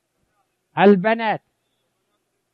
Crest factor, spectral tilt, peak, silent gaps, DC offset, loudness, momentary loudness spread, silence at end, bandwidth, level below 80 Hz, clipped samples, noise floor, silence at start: 18 dB; -9 dB/octave; -2 dBFS; none; under 0.1%; -18 LUFS; 15 LU; 1.15 s; 5.2 kHz; -70 dBFS; under 0.1%; -72 dBFS; 0.75 s